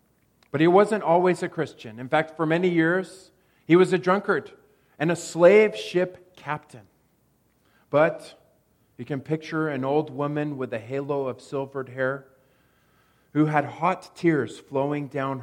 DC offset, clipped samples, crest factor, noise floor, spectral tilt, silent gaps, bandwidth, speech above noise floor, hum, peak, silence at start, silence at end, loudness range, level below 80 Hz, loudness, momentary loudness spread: under 0.1%; under 0.1%; 20 dB; -66 dBFS; -6.5 dB/octave; none; 12 kHz; 42 dB; none; -4 dBFS; 0.55 s; 0 s; 8 LU; -72 dBFS; -24 LUFS; 14 LU